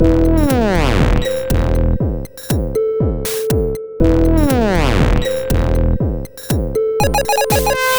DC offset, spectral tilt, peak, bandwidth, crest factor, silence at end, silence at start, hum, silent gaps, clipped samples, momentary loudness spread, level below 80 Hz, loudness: under 0.1%; -6 dB/octave; -2 dBFS; over 20 kHz; 12 dB; 0 s; 0 s; none; none; under 0.1%; 7 LU; -20 dBFS; -16 LUFS